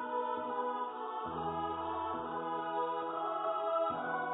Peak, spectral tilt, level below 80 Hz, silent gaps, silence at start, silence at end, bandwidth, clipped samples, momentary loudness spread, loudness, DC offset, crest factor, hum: -22 dBFS; 0 dB/octave; -66 dBFS; none; 0 s; 0 s; 3.9 kHz; under 0.1%; 5 LU; -37 LUFS; under 0.1%; 14 dB; none